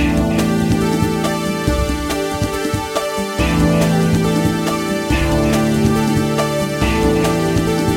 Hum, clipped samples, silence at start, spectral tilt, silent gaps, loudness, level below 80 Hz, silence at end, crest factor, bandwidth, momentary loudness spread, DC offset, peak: none; under 0.1%; 0 s; -5.5 dB/octave; none; -17 LUFS; -28 dBFS; 0 s; 14 dB; 16.5 kHz; 5 LU; under 0.1%; -2 dBFS